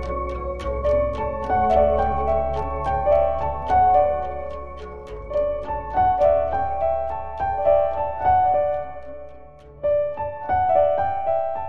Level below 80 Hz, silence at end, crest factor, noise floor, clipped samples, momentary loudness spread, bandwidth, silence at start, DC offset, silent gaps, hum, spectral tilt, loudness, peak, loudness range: -36 dBFS; 0 s; 16 dB; -43 dBFS; under 0.1%; 12 LU; 6.6 kHz; 0 s; 1%; none; none; -8 dB/octave; -22 LUFS; -6 dBFS; 3 LU